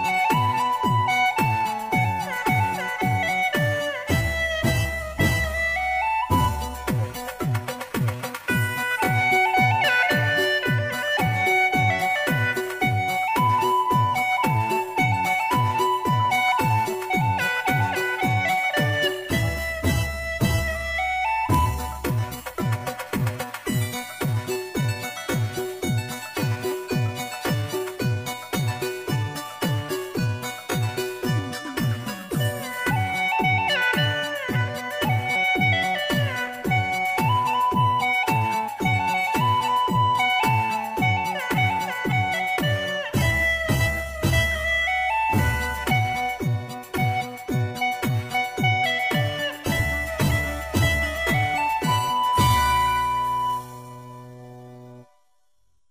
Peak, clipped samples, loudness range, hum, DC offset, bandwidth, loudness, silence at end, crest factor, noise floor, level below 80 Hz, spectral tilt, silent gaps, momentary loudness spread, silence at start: -6 dBFS; under 0.1%; 6 LU; none; under 0.1%; 16 kHz; -23 LUFS; 0.85 s; 18 dB; -71 dBFS; -40 dBFS; -5 dB/octave; none; 7 LU; 0 s